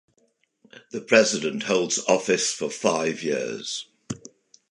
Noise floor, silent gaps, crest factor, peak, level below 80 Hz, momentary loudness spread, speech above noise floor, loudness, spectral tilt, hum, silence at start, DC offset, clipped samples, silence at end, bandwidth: -68 dBFS; none; 22 dB; -2 dBFS; -68 dBFS; 18 LU; 44 dB; -23 LUFS; -2.5 dB/octave; none; 0.75 s; under 0.1%; under 0.1%; 0.55 s; 11.5 kHz